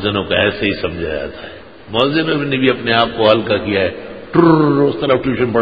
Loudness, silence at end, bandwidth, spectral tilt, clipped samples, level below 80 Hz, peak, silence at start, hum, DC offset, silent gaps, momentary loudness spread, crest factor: -15 LUFS; 0 s; 5 kHz; -8.5 dB/octave; under 0.1%; -40 dBFS; 0 dBFS; 0 s; none; 0.7%; none; 11 LU; 16 dB